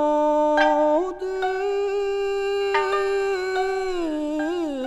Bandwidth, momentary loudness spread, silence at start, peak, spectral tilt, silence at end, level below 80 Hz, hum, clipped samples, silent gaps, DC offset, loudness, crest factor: 11.5 kHz; 7 LU; 0 s; -6 dBFS; -3.5 dB/octave; 0 s; -50 dBFS; none; under 0.1%; none; under 0.1%; -23 LUFS; 16 dB